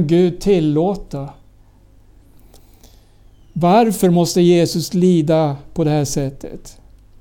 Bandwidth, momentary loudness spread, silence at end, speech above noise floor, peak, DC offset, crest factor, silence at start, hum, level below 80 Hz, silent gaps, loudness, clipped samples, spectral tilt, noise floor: 17.5 kHz; 17 LU; 0.5 s; 32 dB; -2 dBFS; under 0.1%; 14 dB; 0 s; none; -42 dBFS; none; -16 LUFS; under 0.1%; -6.5 dB/octave; -47 dBFS